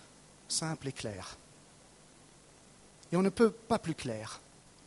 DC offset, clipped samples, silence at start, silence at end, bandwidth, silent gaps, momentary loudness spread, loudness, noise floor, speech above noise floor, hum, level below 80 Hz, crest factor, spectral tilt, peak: under 0.1%; under 0.1%; 0 s; 0.45 s; 11.5 kHz; none; 18 LU; -34 LUFS; -59 dBFS; 26 dB; none; -64 dBFS; 22 dB; -5 dB/octave; -14 dBFS